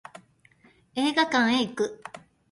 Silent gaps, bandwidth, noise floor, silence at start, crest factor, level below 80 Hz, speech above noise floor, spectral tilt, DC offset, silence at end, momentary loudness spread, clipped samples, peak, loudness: none; 11.5 kHz; -60 dBFS; 0.15 s; 20 dB; -68 dBFS; 35 dB; -3.5 dB/octave; under 0.1%; 0.35 s; 18 LU; under 0.1%; -8 dBFS; -25 LUFS